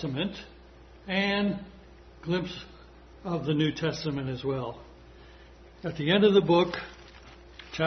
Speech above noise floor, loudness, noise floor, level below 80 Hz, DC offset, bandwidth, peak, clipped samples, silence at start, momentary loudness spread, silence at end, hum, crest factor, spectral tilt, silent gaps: 24 dB; -28 LUFS; -51 dBFS; -54 dBFS; under 0.1%; 6.4 kHz; -10 dBFS; under 0.1%; 0 s; 26 LU; 0 s; none; 20 dB; -6.5 dB/octave; none